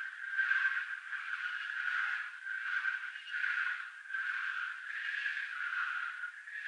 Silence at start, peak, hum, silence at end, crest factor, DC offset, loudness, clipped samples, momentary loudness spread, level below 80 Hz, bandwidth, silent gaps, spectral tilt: 0 s; -20 dBFS; none; 0 s; 18 dB; under 0.1%; -36 LUFS; under 0.1%; 8 LU; under -90 dBFS; 10 kHz; none; 8 dB/octave